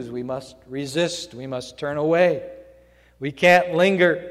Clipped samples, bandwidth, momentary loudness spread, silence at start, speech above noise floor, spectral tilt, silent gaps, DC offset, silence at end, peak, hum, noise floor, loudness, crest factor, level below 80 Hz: under 0.1%; 13.5 kHz; 16 LU; 0 s; 32 dB; -5 dB/octave; none; under 0.1%; 0 s; -2 dBFS; 60 Hz at -50 dBFS; -53 dBFS; -21 LUFS; 20 dB; -58 dBFS